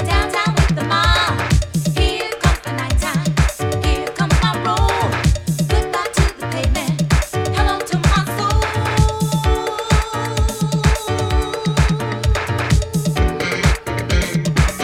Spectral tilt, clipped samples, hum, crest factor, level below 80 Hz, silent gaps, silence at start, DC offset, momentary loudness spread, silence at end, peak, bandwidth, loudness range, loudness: -5 dB/octave; under 0.1%; none; 16 dB; -22 dBFS; none; 0 s; under 0.1%; 4 LU; 0 s; -2 dBFS; 16 kHz; 1 LU; -18 LUFS